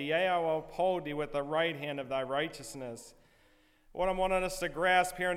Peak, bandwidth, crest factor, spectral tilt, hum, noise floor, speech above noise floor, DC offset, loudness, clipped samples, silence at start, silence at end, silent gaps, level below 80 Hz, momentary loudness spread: -16 dBFS; 16 kHz; 18 dB; -4 dB/octave; none; -65 dBFS; 33 dB; under 0.1%; -32 LUFS; under 0.1%; 0 s; 0 s; none; -54 dBFS; 15 LU